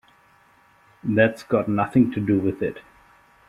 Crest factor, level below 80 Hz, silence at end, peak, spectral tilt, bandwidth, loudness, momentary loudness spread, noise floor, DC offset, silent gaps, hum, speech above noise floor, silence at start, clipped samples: 20 dB; -56 dBFS; 0.7 s; -4 dBFS; -8.5 dB/octave; 12 kHz; -22 LUFS; 10 LU; -57 dBFS; under 0.1%; none; none; 36 dB; 1.05 s; under 0.1%